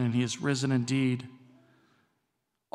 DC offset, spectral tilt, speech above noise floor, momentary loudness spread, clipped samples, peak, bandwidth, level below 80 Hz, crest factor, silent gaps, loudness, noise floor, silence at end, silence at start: under 0.1%; -5.5 dB/octave; 53 dB; 8 LU; under 0.1%; -16 dBFS; 11.5 kHz; -74 dBFS; 16 dB; none; -29 LUFS; -81 dBFS; 1.4 s; 0 s